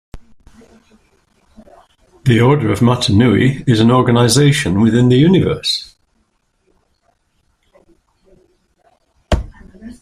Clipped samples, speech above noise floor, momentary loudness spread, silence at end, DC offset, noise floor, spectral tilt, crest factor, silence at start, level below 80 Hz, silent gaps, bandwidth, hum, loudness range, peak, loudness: under 0.1%; 51 dB; 10 LU; 0.1 s; under 0.1%; -63 dBFS; -6 dB/octave; 16 dB; 0.15 s; -34 dBFS; none; 15 kHz; none; 18 LU; 0 dBFS; -13 LUFS